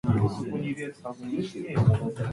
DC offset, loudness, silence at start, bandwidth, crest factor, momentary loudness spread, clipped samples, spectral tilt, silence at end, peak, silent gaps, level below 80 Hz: under 0.1%; -28 LUFS; 0.05 s; 11.5 kHz; 18 dB; 11 LU; under 0.1%; -8.5 dB/octave; 0 s; -8 dBFS; none; -48 dBFS